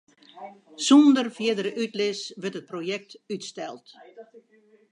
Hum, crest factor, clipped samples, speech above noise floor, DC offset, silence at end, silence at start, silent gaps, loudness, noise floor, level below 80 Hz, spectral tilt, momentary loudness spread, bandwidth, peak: none; 20 dB; under 0.1%; 35 dB; under 0.1%; 0.7 s; 0.35 s; none; -24 LUFS; -60 dBFS; -80 dBFS; -4 dB/octave; 27 LU; 10.5 kHz; -6 dBFS